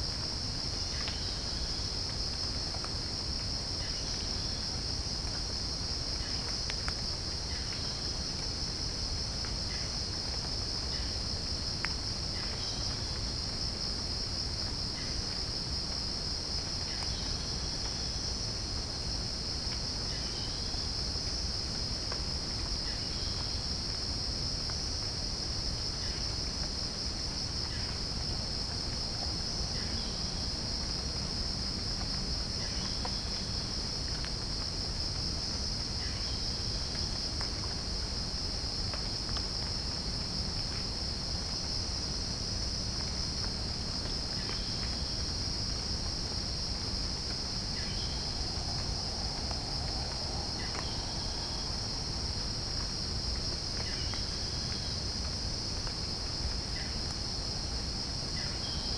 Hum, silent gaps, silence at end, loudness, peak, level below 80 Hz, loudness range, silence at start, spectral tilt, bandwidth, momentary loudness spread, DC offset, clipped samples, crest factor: none; none; 0 s; -34 LUFS; -14 dBFS; -42 dBFS; 1 LU; 0 s; -3 dB/octave; 10.5 kHz; 1 LU; under 0.1%; under 0.1%; 22 dB